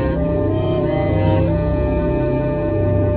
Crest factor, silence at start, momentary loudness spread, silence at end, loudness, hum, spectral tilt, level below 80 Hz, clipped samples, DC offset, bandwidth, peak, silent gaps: 12 dB; 0 s; 2 LU; 0 s; -18 LUFS; none; -12.5 dB/octave; -26 dBFS; under 0.1%; under 0.1%; 4.5 kHz; -6 dBFS; none